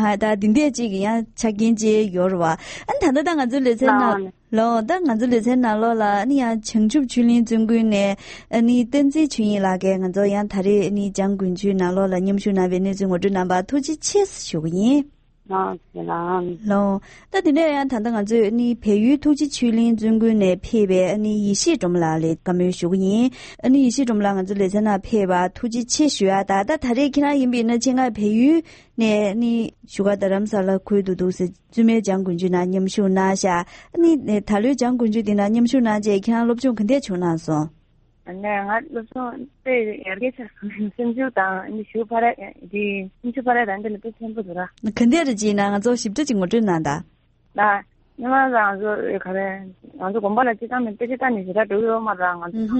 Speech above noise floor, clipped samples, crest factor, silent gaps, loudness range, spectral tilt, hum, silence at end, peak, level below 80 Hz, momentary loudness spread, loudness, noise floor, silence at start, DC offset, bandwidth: 37 dB; under 0.1%; 18 dB; none; 5 LU; -5.5 dB/octave; none; 0 s; 0 dBFS; -50 dBFS; 9 LU; -20 LUFS; -57 dBFS; 0 s; under 0.1%; 8.8 kHz